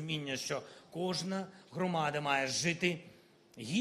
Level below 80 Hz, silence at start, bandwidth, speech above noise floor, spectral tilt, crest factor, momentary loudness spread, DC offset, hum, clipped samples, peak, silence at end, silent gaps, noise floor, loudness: -76 dBFS; 0 s; 14 kHz; 21 dB; -4 dB/octave; 20 dB; 13 LU; under 0.1%; none; under 0.1%; -16 dBFS; 0 s; none; -56 dBFS; -35 LUFS